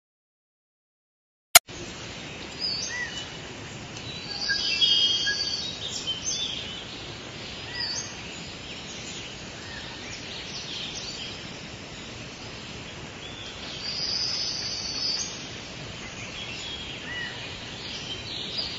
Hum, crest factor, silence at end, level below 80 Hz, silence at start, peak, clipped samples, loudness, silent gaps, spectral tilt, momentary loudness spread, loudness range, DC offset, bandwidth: none; 32 dB; 0 s; -54 dBFS; 1.55 s; 0 dBFS; under 0.1%; -28 LUFS; 1.60-1.64 s; -1 dB/octave; 16 LU; 10 LU; under 0.1%; 15 kHz